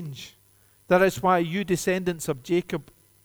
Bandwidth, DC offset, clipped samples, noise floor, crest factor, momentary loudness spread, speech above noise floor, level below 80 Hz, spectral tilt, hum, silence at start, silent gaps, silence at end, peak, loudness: over 20 kHz; under 0.1%; under 0.1%; -60 dBFS; 18 dB; 16 LU; 36 dB; -56 dBFS; -5.5 dB/octave; none; 0 s; none; 0.45 s; -8 dBFS; -24 LUFS